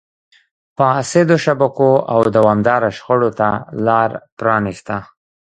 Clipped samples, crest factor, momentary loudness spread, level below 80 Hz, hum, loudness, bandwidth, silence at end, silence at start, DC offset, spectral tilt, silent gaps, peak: under 0.1%; 16 dB; 9 LU; -52 dBFS; none; -15 LUFS; 9.4 kHz; 0.55 s; 0.8 s; under 0.1%; -6.5 dB/octave; 4.32-4.37 s; 0 dBFS